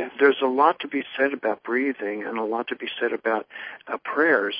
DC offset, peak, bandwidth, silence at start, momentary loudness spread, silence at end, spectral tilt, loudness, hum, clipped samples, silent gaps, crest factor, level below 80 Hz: under 0.1%; -4 dBFS; 5.2 kHz; 0 s; 10 LU; 0 s; -8 dB/octave; -24 LUFS; none; under 0.1%; none; 20 dB; -78 dBFS